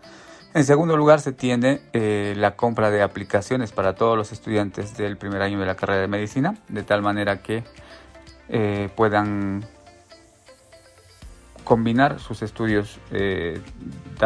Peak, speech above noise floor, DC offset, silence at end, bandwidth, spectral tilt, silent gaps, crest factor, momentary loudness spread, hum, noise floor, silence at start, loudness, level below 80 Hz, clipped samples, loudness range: -2 dBFS; 30 dB; under 0.1%; 0 s; 11 kHz; -6.5 dB/octave; none; 22 dB; 12 LU; none; -51 dBFS; 0.05 s; -22 LUFS; -50 dBFS; under 0.1%; 6 LU